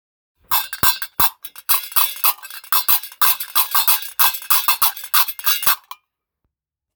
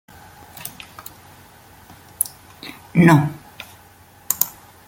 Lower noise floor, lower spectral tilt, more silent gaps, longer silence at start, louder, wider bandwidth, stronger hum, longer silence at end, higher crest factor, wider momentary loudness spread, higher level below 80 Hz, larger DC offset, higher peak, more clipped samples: first, -77 dBFS vs -48 dBFS; second, 1.5 dB/octave vs -5.5 dB/octave; neither; about the same, 0.5 s vs 0.6 s; first, -15 LUFS vs -18 LUFS; first, over 20 kHz vs 17 kHz; neither; first, 1.15 s vs 0.4 s; about the same, 20 dB vs 24 dB; second, 5 LU vs 25 LU; about the same, -54 dBFS vs -56 dBFS; neither; about the same, 0 dBFS vs 0 dBFS; neither